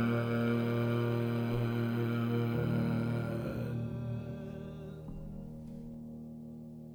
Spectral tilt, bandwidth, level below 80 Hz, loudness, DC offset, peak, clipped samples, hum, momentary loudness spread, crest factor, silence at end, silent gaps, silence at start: -8.5 dB/octave; 17 kHz; -54 dBFS; -34 LUFS; under 0.1%; -20 dBFS; under 0.1%; none; 14 LU; 14 dB; 0 s; none; 0 s